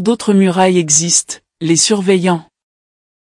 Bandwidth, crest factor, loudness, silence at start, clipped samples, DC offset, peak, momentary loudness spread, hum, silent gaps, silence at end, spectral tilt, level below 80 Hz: 12 kHz; 14 dB; -12 LUFS; 0 s; under 0.1%; under 0.1%; 0 dBFS; 10 LU; none; none; 0.8 s; -3.5 dB/octave; -60 dBFS